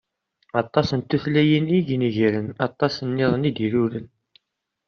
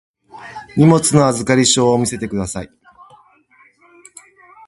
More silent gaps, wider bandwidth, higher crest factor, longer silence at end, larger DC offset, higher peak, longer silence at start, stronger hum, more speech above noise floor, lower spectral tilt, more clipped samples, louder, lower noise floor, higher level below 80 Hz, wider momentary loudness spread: neither; second, 6.8 kHz vs 11.5 kHz; about the same, 20 dB vs 18 dB; second, 0.8 s vs 2 s; neither; second, -4 dBFS vs 0 dBFS; first, 0.55 s vs 0.35 s; neither; first, 58 dB vs 38 dB; first, -6 dB/octave vs -4.5 dB/octave; neither; second, -22 LUFS vs -14 LUFS; first, -80 dBFS vs -52 dBFS; second, -56 dBFS vs -46 dBFS; second, 8 LU vs 22 LU